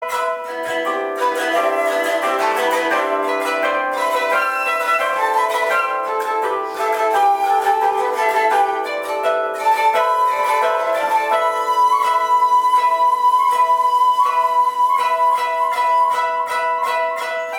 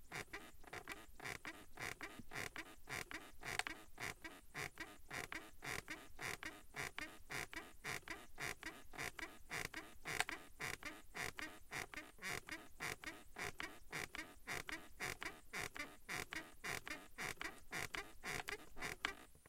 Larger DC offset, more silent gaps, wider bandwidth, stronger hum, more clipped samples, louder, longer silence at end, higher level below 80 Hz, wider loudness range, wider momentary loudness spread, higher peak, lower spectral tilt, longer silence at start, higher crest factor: neither; neither; first, 19.5 kHz vs 16.5 kHz; neither; neither; first, -17 LUFS vs -48 LUFS; about the same, 0 s vs 0 s; second, -70 dBFS vs -64 dBFS; about the same, 3 LU vs 2 LU; about the same, 6 LU vs 6 LU; first, -4 dBFS vs -20 dBFS; about the same, -1 dB/octave vs -2 dB/octave; about the same, 0 s vs 0 s; second, 14 dB vs 30 dB